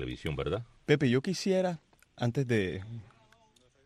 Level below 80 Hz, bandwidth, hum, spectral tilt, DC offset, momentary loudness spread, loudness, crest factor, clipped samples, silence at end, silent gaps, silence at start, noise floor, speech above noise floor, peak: -54 dBFS; 14 kHz; none; -6 dB/octave; under 0.1%; 15 LU; -31 LUFS; 20 dB; under 0.1%; 0.8 s; none; 0 s; -65 dBFS; 35 dB; -12 dBFS